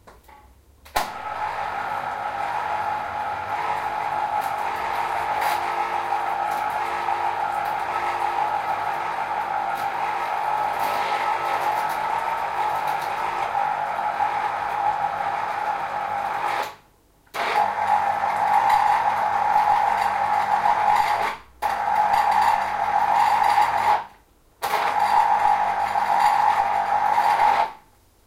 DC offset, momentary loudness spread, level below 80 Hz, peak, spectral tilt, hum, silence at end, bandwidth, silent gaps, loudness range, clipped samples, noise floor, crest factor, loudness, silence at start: under 0.1%; 8 LU; -56 dBFS; -6 dBFS; -2.5 dB/octave; none; 0.5 s; 16.5 kHz; none; 5 LU; under 0.1%; -57 dBFS; 16 dB; -23 LUFS; 0.05 s